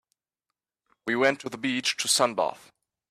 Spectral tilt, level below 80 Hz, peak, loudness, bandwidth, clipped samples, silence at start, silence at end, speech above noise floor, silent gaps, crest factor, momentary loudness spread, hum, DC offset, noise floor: -2 dB/octave; -74 dBFS; -8 dBFS; -25 LUFS; 15.5 kHz; under 0.1%; 1.05 s; 0.55 s; 61 dB; none; 20 dB; 8 LU; none; under 0.1%; -87 dBFS